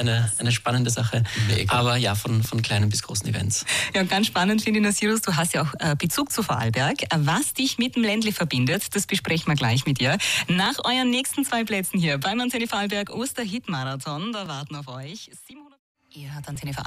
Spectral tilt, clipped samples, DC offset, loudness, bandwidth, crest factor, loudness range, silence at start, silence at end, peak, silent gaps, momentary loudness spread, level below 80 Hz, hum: -4 dB/octave; under 0.1%; under 0.1%; -23 LUFS; 15.5 kHz; 16 dB; 6 LU; 0 s; 0 s; -8 dBFS; 15.79-15.95 s; 9 LU; -52 dBFS; none